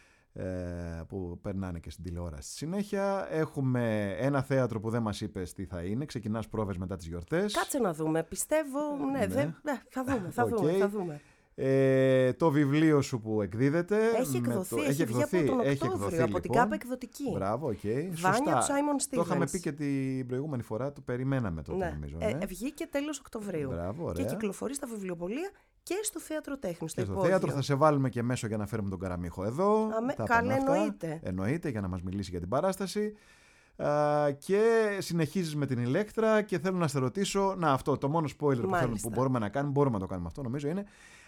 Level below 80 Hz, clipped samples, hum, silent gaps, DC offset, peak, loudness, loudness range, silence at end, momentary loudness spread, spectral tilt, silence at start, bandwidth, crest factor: -56 dBFS; under 0.1%; none; none; under 0.1%; -10 dBFS; -31 LUFS; 7 LU; 0.1 s; 11 LU; -6 dB/octave; 0.35 s; 18.5 kHz; 20 dB